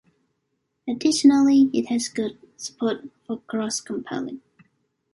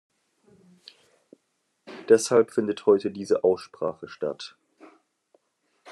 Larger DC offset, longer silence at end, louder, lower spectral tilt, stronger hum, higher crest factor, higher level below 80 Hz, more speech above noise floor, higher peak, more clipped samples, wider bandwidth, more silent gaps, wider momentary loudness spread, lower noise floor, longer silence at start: neither; first, 0.75 s vs 0 s; about the same, -22 LUFS vs -24 LUFS; about the same, -3.5 dB/octave vs -4.5 dB/octave; neither; about the same, 18 dB vs 22 dB; first, -66 dBFS vs -80 dBFS; about the same, 53 dB vs 51 dB; about the same, -4 dBFS vs -6 dBFS; neither; about the same, 11.5 kHz vs 12 kHz; neither; about the same, 19 LU vs 19 LU; about the same, -75 dBFS vs -74 dBFS; second, 0.85 s vs 1.9 s